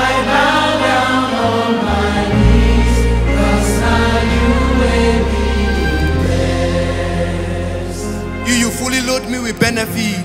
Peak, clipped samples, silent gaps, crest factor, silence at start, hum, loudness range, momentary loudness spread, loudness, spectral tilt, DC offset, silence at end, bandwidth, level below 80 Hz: 0 dBFS; under 0.1%; none; 14 dB; 0 s; none; 4 LU; 7 LU; -15 LUFS; -5 dB/octave; under 0.1%; 0 s; 16 kHz; -20 dBFS